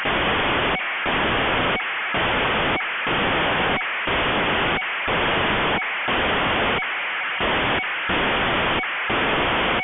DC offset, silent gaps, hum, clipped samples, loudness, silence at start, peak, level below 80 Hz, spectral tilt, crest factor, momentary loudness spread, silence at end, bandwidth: under 0.1%; none; none; under 0.1%; -21 LUFS; 0 s; -12 dBFS; -40 dBFS; -7.5 dB/octave; 10 dB; 3 LU; 0 s; 4.1 kHz